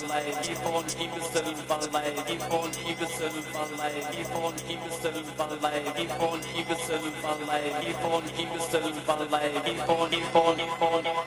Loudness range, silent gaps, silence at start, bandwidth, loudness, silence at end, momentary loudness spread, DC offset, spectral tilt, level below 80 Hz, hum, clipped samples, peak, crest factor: 4 LU; none; 0 s; 16 kHz; -29 LUFS; 0 s; 6 LU; under 0.1%; -3.5 dB/octave; -60 dBFS; none; under 0.1%; -8 dBFS; 20 dB